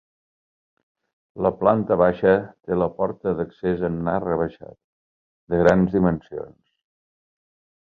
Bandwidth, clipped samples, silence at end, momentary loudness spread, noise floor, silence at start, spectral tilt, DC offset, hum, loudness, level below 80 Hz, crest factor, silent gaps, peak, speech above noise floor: 7.2 kHz; under 0.1%; 1.45 s; 10 LU; under -90 dBFS; 1.35 s; -9.5 dB/octave; under 0.1%; none; -22 LUFS; -48 dBFS; 22 dB; 4.84-5.47 s; -2 dBFS; over 69 dB